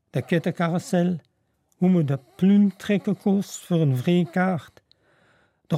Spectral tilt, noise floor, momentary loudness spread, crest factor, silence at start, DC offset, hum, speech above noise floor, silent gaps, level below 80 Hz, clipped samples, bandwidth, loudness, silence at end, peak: -7.5 dB/octave; -69 dBFS; 6 LU; 14 dB; 0.15 s; under 0.1%; none; 47 dB; none; -68 dBFS; under 0.1%; 14.5 kHz; -23 LUFS; 0 s; -8 dBFS